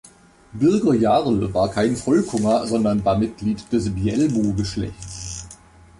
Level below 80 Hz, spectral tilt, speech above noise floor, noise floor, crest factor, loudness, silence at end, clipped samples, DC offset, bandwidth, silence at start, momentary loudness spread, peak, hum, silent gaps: -42 dBFS; -6.5 dB/octave; 29 dB; -49 dBFS; 14 dB; -20 LUFS; 0.45 s; under 0.1%; under 0.1%; 11.5 kHz; 0.55 s; 14 LU; -6 dBFS; none; none